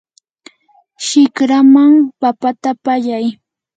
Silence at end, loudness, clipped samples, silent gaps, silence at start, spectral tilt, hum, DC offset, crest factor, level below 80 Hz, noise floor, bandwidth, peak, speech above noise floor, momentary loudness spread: 0.45 s; -12 LUFS; under 0.1%; none; 1 s; -3.5 dB/octave; none; under 0.1%; 12 dB; -70 dBFS; -53 dBFS; 9.2 kHz; 0 dBFS; 42 dB; 12 LU